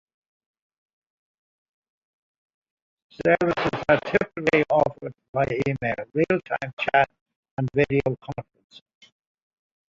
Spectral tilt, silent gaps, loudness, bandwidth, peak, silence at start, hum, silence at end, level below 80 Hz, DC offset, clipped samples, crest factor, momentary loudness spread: -7 dB/octave; 5.28-5.33 s, 6.73-6.77 s, 7.21-7.26 s, 7.36-7.43 s, 7.51-7.57 s; -24 LUFS; 7.8 kHz; -4 dBFS; 3.2 s; none; 1.45 s; -54 dBFS; under 0.1%; under 0.1%; 22 dB; 10 LU